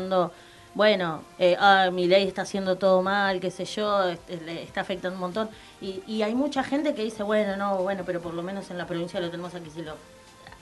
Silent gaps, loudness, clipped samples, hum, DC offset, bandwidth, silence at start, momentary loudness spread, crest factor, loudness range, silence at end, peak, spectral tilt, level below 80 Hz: none; -26 LUFS; under 0.1%; none; under 0.1%; 12 kHz; 0 s; 15 LU; 20 dB; 7 LU; 0.05 s; -6 dBFS; -5 dB/octave; -60 dBFS